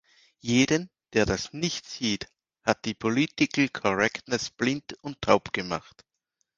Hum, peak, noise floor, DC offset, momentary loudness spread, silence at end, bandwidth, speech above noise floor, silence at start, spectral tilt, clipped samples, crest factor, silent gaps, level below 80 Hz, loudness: none; -4 dBFS; -79 dBFS; under 0.1%; 10 LU; 0.8 s; 10 kHz; 52 dB; 0.45 s; -4 dB/octave; under 0.1%; 24 dB; none; -54 dBFS; -27 LUFS